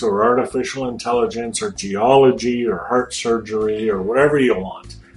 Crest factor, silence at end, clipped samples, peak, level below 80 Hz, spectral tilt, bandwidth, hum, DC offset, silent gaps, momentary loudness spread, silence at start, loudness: 16 dB; 0.15 s; under 0.1%; -2 dBFS; -46 dBFS; -5 dB/octave; 11.5 kHz; none; under 0.1%; none; 10 LU; 0 s; -18 LUFS